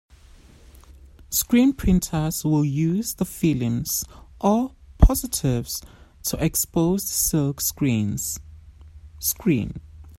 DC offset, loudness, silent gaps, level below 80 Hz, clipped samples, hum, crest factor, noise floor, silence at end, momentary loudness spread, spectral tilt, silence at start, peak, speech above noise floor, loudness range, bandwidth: under 0.1%; -23 LUFS; none; -30 dBFS; under 0.1%; none; 22 dB; -49 dBFS; 0.1 s; 10 LU; -5 dB/octave; 0.9 s; 0 dBFS; 27 dB; 2 LU; 16.5 kHz